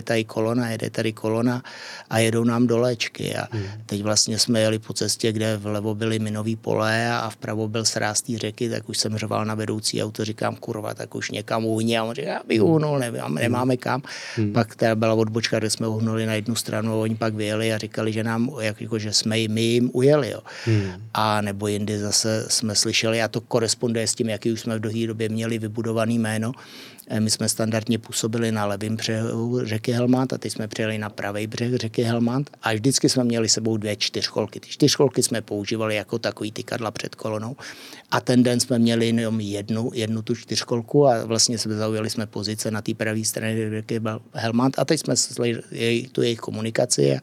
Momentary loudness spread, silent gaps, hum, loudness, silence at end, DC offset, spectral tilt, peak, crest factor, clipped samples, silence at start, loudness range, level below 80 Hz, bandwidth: 9 LU; none; none; -23 LUFS; 0 s; under 0.1%; -4.5 dB/octave; -6 dBFS; 18 dB; under 0.1%; 0 s; 3 LU; -72 dBFS; 16 kHz